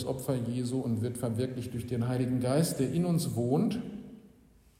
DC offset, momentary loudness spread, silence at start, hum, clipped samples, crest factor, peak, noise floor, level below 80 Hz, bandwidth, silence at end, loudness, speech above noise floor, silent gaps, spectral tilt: under 0.1%; 9 LU; 0 s; none; under 0.1%; 16 dB; -14 dBFS; -60 dBFS; -60 dBFS; 16 kHz; 0.5 s; -31 LUFS; 30 dB; none; -6.5 dB/octave